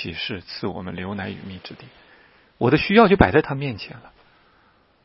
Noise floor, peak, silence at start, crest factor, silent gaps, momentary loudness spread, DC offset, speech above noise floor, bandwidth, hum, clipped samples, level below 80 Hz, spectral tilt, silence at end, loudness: -59 dBFS; 0 dBFS; 0 s; 22 dB; none; 22 LU; under 0.1%; 37 dB; 5.8 kHz; none; under 0.1%; -40 dBFS; -9.5 dB/octave; 0.95 s; -20 LUFS